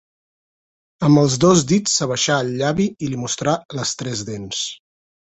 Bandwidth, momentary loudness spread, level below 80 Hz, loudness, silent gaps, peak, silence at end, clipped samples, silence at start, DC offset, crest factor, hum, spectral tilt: 8.2 kHz; 12 LU; -52 dBFS; -19 LUFS; 3.65-3.69 s; -2 dBFS; 0.55 s; under 0.1%; 1 s; under 0.1%; 18 dB; none; -4.5 dB/octave